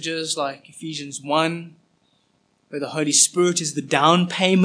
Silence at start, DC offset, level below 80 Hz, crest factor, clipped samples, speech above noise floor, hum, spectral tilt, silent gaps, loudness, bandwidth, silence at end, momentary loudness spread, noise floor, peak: 0 s; under 0.1%; -78 dBFS; 20 dB; under 0.1%; 44 dB; none; -3 dB/octave; none; -20 LUFS; 10.5 kHz; 0 s; 16 LU; -65 dBFS; 0 dBFS